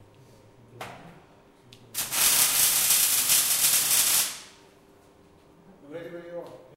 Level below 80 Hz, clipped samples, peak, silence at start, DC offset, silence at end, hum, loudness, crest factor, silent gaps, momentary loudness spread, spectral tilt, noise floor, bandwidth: -64 dBFS; under 0.1%; -6 dBFS; 0.75 s; under 0.1%; 0.2 s; none; -20 LUFS; 22 dB; none; 23 LU; 1 dB/octave; -56 dBFS; 16 kHz